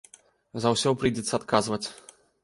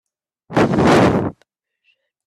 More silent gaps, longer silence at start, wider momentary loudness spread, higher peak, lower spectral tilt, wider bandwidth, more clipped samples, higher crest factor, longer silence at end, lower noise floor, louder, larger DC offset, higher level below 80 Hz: neither; about the same, 0.55 s vs 0.5 s; about the same, 11 LU vs 10 LU; second, -4 dBFS vs 0 dBFS; second, -4.5 dB/octave vs -6.5 dB/octave; second, 11.5 kHz vs 13.5 kHz; neither; first, 24 dB vs 18 dB; second, 0.45 s vs 0.95 s; second, -56 dBFS vs -65 dBFS; second, -26 LUFS vs -16 LUFS; neither; second, -56 dBFS vs -44 dBFS